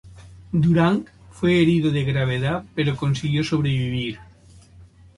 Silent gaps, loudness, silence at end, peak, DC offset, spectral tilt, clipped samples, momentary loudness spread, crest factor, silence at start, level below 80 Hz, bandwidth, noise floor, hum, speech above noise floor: none; -21 LUFS; 0.35 s; -6 dBFS; under 0.1%; -7 dB/octave; under 0.1%; 9 LU; 16 dB; 0.05 s; -46 dBFS; 11.5 kHz; -48 dBFS; none; 28 dB